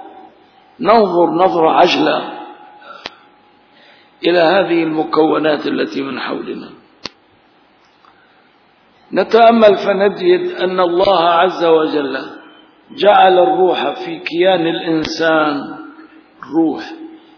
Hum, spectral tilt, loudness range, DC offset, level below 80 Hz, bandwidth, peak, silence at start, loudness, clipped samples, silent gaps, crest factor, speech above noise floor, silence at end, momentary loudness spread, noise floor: none; -6 dB/octave; 7 LU; under 0.1%; -56 dBFS; 5.4 kHz; 0 dBFS; 0 s; -13 LUFS; under 0.1%; none; 14 dB; 38 dB; 0.2 s; 20 LU; -51 dBFS